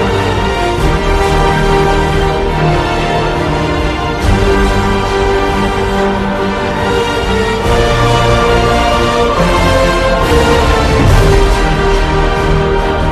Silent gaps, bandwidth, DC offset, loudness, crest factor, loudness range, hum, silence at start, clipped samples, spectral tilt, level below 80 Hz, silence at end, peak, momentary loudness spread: none; 13.5 kHz; under 0.1%; -11 LUFS; 10 dB; 3 LU; none; 0 s; under 0.1%; -5.5 dB/octave; -16 dBFS; 0 s; 0 dBFS; 4 LU